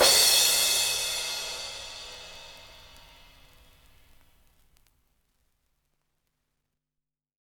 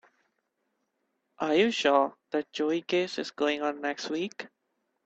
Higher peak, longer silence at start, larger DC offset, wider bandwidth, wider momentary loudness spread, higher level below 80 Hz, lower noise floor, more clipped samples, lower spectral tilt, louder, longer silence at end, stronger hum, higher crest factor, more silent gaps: about the same, -8 dBFS vs -10 dBFS; second, 0 s vs 1.4 s; neither; first, over 20 kHz vs 8.4 kHz; first, 26 LU vs 10 LU; first, -60 dBFS vs -74 dBFS; first, -87 dBFS vs -79 dBFS; neither; second, 1.5 dB/octave vs -4 dB/octave; first, -22 LUFS vs -29 LUFS; first, 4.85 s vs 0.6 s; neither; about the same, 22 dB vs 20 dB; neither